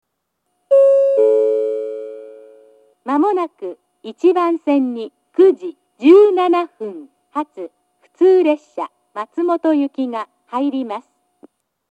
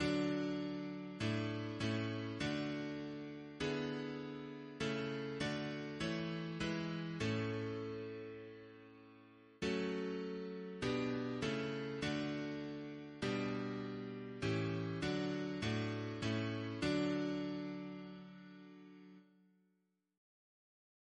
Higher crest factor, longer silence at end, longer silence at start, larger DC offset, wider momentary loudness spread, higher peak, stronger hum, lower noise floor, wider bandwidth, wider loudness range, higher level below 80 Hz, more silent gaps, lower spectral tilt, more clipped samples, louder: about the same, 16 dB vs 16 dB; second, 0.9 s vs 1.95 s; first, 0.7 s vs 0 s; neither; first, 20 LU vs 13 LU; first, 0 dBFS vs -24 dBFS; neither; second, -73 dBFS vs -82 dBFS; second, 8.4 kHz vs 10 kHz; about the same, 5 LU vs 4 LU; second, -84 dBFS vs -66 dBFS; neither; about the same, -5.5 dB/octave vs -6 dB/octave; neither; first, -16 LUFS vs -41 LUFS